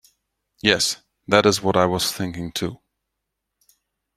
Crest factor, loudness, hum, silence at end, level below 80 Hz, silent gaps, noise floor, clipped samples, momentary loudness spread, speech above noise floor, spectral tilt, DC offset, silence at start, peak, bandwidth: 22 dB; -20 LUFS; none; 1.4 s; -56 dBFS; none; -80 dBFS; under 0.1%; 11 LU; 60 dB; -3.5 dB/octave; under 0.1%; 0.65 s; 0 dBFS; 16 kHz